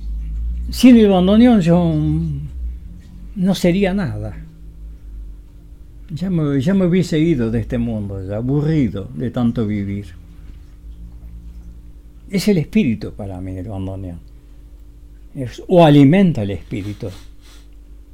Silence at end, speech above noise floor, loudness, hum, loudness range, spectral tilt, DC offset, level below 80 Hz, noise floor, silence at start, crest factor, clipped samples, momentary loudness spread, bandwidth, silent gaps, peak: 0.15 s; 24 dB; -16 LUFS; none; 8 LU; -7.5 dB/octave; under 0.1%; -32 dBFS; -39 dBFS; 0 s; 18 dB; under 0.1%; 26 LU; 16 kHz; none; 0 dBFS